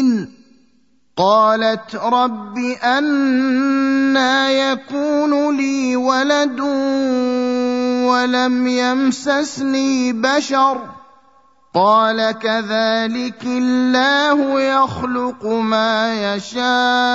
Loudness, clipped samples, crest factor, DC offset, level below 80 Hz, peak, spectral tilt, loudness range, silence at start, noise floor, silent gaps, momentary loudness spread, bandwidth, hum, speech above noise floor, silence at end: -16 LUFS; under 0.1%; 16 dB; 0.1%; -60 dBFS; -2 dBFS; -4 dB/octave; 2 LU; 0 s; -60 dBFS; none; 7 LU; 7.8 kHz; none; 44 dB; 0 s